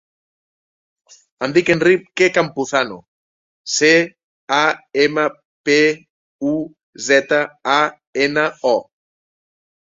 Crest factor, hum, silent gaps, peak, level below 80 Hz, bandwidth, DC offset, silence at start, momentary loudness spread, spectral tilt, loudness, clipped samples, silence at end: 18 dB; none; 3.08-3.65 s, 4.24-4.48 s, 5.45-5.64 s, 6.10-6.39 s, 6.83-6.93 s, 8.07-8.13 s; 0 dBFS; -62 dBFS; 7.8 kHz; under 0.1%; 1.4 s; 12 LU; -3.5 dB/octave; -17 LUFS; under 0.1%; 1 s